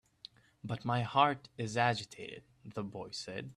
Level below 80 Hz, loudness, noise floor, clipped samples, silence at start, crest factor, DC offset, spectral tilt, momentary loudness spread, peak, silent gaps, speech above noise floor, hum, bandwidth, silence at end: -70 dBFS; -34 LUFS; -58 dBFS; under 0.1%; 0.65 s; 24 dB; under 0.1%; -5 dB/octave; 22 LU; -12 dBFS; none; 23 dB; none; 11.5 kHz; 0.05 s